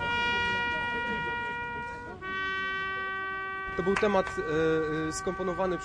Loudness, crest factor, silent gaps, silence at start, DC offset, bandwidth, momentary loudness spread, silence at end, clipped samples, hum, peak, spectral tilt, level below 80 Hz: -30 LUFS; 18 dB; none; 0 s; under 0.1%; 11 kHz; 8 LU; 0 s; under 0.1%; none; -12 dBFS; -4.5 dB/octave; -52 dBFS